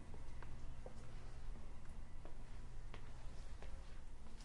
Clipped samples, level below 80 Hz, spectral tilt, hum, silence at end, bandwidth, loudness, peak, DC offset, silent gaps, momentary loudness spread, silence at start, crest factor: under 0.1%; -50 dBFS; -5.5 dB/octave; none; 0 s; 10.5 kHz; -57 LUFS; -36 dBFS; under 0.1%; none; 2 LU; 0 s; 10 dB